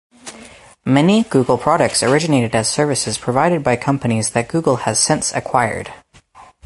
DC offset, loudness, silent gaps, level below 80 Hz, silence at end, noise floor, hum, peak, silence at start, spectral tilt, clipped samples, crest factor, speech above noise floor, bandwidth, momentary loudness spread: under 0.1%; -16 LUFS; none; -48 dBFS; 0.2 s; -45 dBFS; none; -2 dBFS; 0.25 s; -4.5 dB/octave; under 0.1%; 16 dB; 29 dB; 11.5 kHz; 10 LU